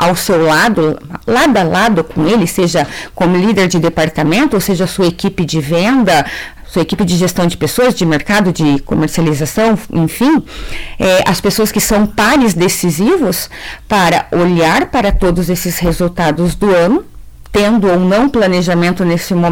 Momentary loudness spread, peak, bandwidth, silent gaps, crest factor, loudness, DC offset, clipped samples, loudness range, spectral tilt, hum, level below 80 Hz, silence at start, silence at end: 6 LU; -4 dBFS; 18 kHz; none; 8 dB; -12 LUFS; 0.7%; under 0.1%; 1 LU; -5 dB/octave; none; -30 dBFS; 0 s; 0 s